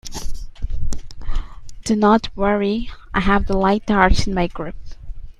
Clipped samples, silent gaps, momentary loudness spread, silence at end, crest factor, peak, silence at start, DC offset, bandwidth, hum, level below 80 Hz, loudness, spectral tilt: under 0.1%; none; 18 LU; 0.05 s; 18 dB; 0 dBFS; 0.05 s; under 0.1%; 11.5 kHz; none; -26 dBFS; -19 LUFS; -5.5 dB/octave